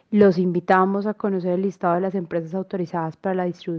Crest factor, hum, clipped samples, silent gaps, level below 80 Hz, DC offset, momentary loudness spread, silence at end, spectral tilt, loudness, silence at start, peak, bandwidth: 18 dB; none; under 0.1%; none; -64 dBFS; under 0.1%; 10 LU; 0 s; -9 dB/octave; -22 LUFS; 0.1 s; -4 dBFS; 6.6 kHz